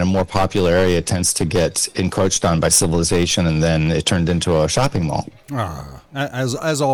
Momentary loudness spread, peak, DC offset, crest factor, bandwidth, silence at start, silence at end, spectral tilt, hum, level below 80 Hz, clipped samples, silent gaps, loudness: 11 LU; -2 dBFS; under 0.1%; 16 dB; over 20 kHz; 0 s; 0 s; -4.5 dB/octave; none; -36 dBFS; under 0.1%; none; -18 LUFS